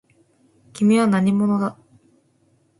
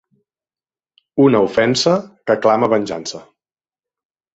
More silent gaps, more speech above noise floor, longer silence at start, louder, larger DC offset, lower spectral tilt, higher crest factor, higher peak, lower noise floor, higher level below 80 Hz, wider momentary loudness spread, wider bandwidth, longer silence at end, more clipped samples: neither; second, 44 dB vs over 75 dB; second, 0.75 s vs 1.15 s; second, -19 LUFS vs -16 LUFS; neither; first, -7 dB/octave vs -5 dB/octave; about the same, 14 dB vs 18 dB; second, -6 dBFS vs -2 dBFS; second, -61 dBFS vs under -90 dBFS; second, -64 dBFS vs -56 dBFS; second, 7 LU vs 13 LU; first, 11.5 kHz vs 8.2 kHz; about the same, 1.1 s vs 1.15 s; neither